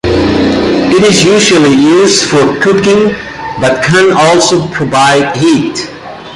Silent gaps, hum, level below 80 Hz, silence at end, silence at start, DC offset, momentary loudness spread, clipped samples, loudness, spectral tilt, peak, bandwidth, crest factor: none; none; -34 dBFS; 0 s; 0.05 s; under 0.1%; 8 LU; under 0.1%; -7 LUFS; -4 dB/octave; 0 dBFS; 11.5 kHz; 8 dB